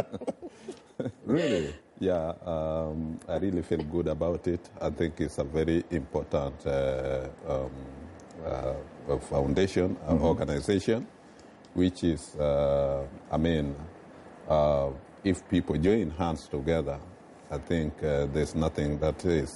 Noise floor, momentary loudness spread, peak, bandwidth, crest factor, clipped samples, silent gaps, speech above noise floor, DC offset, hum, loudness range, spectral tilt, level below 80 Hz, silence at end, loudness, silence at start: -52 dBFS; 13 LU; -14 dBFS; 11.5 kHz; 16 dB; under 0.1%; none; 23 dB; under 0.1%; none; 3 LU; -7 dB/octave; -44 dBFS; 0 s; -30 LUFS; 0 s